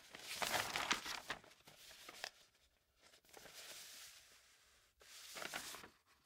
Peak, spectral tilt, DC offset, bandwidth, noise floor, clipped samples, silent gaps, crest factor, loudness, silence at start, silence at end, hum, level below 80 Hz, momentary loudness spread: -20 dBFS; -0.5 dB/octave; under 0.1%; 16 kHz; -77 dBFS; under 0.1%; none; 30 dB; -45 LUFS; 0 s; 0.1 s; none; -78 dBFS; 23 LU